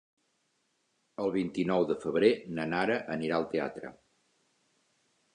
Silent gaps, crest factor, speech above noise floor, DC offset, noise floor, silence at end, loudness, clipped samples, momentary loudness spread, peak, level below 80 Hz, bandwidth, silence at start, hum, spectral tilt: none; 22 dB; 46 dB; under 0.1%; -76 dBFS; 1.4 s; -30 LUFS; under 0.1%; 12 LU; -10 dBFS; -68 dBFS; 10 kHz; 1.2 s; none; -6.5 dB/octave